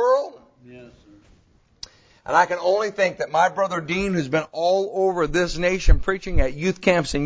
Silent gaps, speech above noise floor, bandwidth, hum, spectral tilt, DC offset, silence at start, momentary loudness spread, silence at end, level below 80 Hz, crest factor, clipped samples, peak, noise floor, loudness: none; 38 dB; 8 kHz; none; -5.5 dB/octave; under 0.1%; 0 s; 9 LU; 0 s; -28 dBFS; 20 dB; under 0.1%; -2 dBFS; -58 dBFS; -22 LUFS